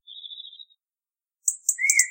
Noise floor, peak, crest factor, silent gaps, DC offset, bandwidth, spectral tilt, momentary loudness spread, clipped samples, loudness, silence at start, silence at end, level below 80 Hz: under -90 dBFS; -2 dBFS; 26 dB; none; under 0.1%; 17 kHz; 11.5 dB/octave; 20 LU; under 0.1%; -22 LUFS; 0.1 s; 0 s; -88 dBFS